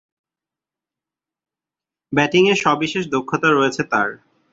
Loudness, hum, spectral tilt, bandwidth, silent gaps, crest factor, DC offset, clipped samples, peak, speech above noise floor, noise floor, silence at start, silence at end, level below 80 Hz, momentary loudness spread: -18 LUFS; none; -5 dB/octave; 7.8 kHz; none; 20 dB; under 0.1%; under 0.1%; -2 dBFS; 71 dB; -89 dBFS; 2.1 s; 0.35 s; -60 dBFS; 8 LU